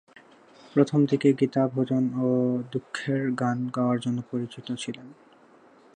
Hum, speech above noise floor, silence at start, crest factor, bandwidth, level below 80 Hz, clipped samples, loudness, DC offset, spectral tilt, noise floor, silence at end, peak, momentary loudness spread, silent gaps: none; 30 dB; 0.65 s; 20 dB; 10 kHz; -72 dBFS; under 0.1%; -26 LUFS; under 0.1%; -7 dB/octave; -55 dBFS; 0.85 s; -6 dBFS; 11 LU; none